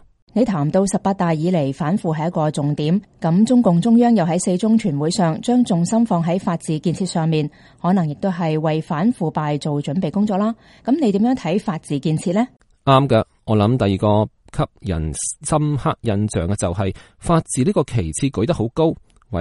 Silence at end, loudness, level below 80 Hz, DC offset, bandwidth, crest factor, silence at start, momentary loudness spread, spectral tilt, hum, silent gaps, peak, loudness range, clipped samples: 0 s; -19 LUFS; -42 dBFS; under 0.1%; 11.5 kHz; 18 dB; 0.35 s; 8 LU; -6.5 dB/octave; none; none; 0 dBFS; 4 LU; under 0.1%